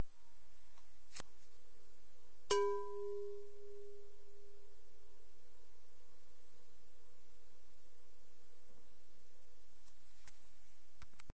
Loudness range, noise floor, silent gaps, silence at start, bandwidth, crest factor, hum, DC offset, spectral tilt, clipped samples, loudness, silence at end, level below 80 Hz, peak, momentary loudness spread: 19 LU; -72 dBFS; none; 0 s; 8 kHz; 26 dB; none; 1%; -3.5 dB/octave; under 0.1%; -43 LUFS; 0 s; -72 dBFS; -22 dBFS; 28 LU